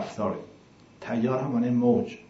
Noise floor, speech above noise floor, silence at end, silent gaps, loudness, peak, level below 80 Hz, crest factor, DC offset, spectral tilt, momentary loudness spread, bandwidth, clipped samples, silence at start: -53 dBFS; 28 dB; 0.1 s; none; -26 LUFS; -10 dBFS; -68 dBFS; 16 dB; under 0.1%; -8 dB/octave; 12 LU; 7.8 kHz; under 0.1%; 0 s